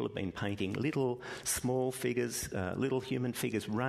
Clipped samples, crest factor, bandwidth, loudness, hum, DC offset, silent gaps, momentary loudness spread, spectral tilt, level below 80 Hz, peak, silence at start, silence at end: under 0.1%; 16 dB; 13.5 kHz; -35 LUFS; none; under 0.1%; none; 4 LU; -5 dB/octave; -60 dBFS; -18 dBFS; 0 s; 0 s